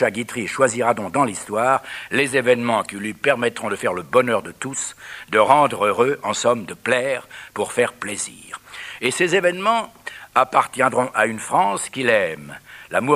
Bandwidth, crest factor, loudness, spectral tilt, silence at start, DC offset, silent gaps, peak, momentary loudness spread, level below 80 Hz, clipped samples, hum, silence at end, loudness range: 15.5 kHz; 20 dB; -20 LUFS; -3.5 dB/octave; 0 s; under 0.1%; none; 0 dBFS; 11 LU; -62 dBFS; under 0.1%; none; 0 s; 3 LU